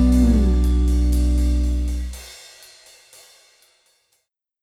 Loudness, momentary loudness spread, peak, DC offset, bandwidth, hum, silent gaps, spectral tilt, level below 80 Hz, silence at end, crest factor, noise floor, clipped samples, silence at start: -20 LUFS; 21 LU; -6 dBFS; under 0.1%; 13 kHz; none; none; -7.5 dB/octave; -22 dBFS; 2.25 s; 14 dB; -70 dBFS; under 0.1%; 0 s